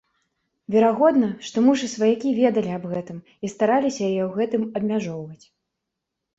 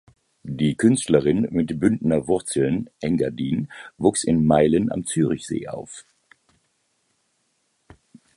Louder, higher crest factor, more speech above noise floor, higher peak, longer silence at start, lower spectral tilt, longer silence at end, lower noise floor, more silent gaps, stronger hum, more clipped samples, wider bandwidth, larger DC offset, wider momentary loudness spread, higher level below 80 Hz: about the same, -22 LUFS vs -21 LUFS; about the same, 18 dB vs 20 dB; first, 61 dB vs 49 dB; second, -6 dBFS vs -2 dBFS; first, 0.7 s vs 0.45 s; about the same, -6 dB/octave vs -6 dB/octave; second, 1.05 s vs 2.35 s; first, -82 dBFS vs -70 dBFS; neither; neither; neither; second, 8 kHz vs 11.5 kHz; neither; about the same, 14 LU vs 16 LU; second, -66 dBFS vs -50 dBFS